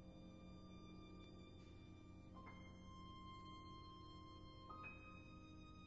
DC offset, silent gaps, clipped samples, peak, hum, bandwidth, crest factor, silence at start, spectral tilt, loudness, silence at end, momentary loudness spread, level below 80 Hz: under 0.1%; none; under 0.1%; -44 dBFS; 60 Hz at -70 dBFS; 7.4 kHz; 14 dB; 0 s; -4.5 dB/octave; -60 LUFS; 0 s; 5 LU; -68 dBFS